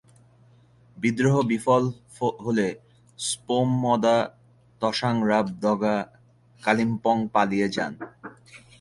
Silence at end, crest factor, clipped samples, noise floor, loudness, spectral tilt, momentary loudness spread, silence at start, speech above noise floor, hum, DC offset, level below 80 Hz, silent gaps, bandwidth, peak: 0.25 s; 20 dB; under 0.1%; -56 dBFS; -24 LUFS; -5.5 dB/octave; 11 LU; 0.95 s; 33 dB; none; under 0.1%; -62 dBFS; none; 11.5 kHz; -6 dBFS